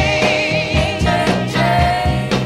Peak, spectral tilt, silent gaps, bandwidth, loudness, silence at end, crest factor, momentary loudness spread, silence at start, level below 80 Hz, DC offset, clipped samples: -2 dBFS; -5.5 dB/octave; none; 15 kHz; -15 LUFS; 0 s; 14 dB; 3 LU; 0 s; -28 dBFS; under 0.1%; under 0.1%